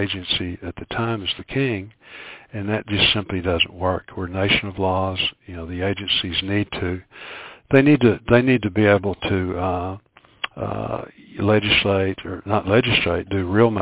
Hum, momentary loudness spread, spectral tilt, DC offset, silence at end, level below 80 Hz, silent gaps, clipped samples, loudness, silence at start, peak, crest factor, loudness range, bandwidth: none; 16 LU; -10 dB/octave; under 0.1%; 0 s; -40 dBFS; none; under 0.1%; -20 LUFS; 0 s; 0 dBFS; 20 dB; 4 LU; 4 kHz